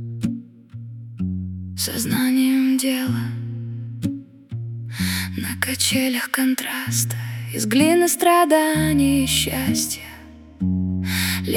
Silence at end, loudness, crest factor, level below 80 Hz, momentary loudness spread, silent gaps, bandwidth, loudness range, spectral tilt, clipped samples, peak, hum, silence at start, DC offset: 0 s; -21 LUFS; 20 dB; -48 dBFS; 15 LU; none; 18 kHz; 6 LU; -4 dB/octave; under 0.1%; -2 dBFS; none; 0 s; under 0.1%